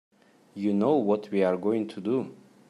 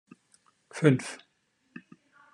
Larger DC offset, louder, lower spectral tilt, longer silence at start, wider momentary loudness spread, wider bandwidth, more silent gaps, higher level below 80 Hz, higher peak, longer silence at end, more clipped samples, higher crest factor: neither; about the same, -27 LUFS vs -27 LUFS; first, -8.5 dB/octave vs -6.5 dB/octave; second, 0.55 s vs 0.75 s; second, 8 LU vs 26 LU; about the same, 11 kHz vs 11 kHz; neither; about the same, -78 dBFS vs -76 dBFS; second, -12 dBFS vs -6 dBFS; second, 0.35 s vs 1.2 s; neither; second, 16 dB vs 26 dB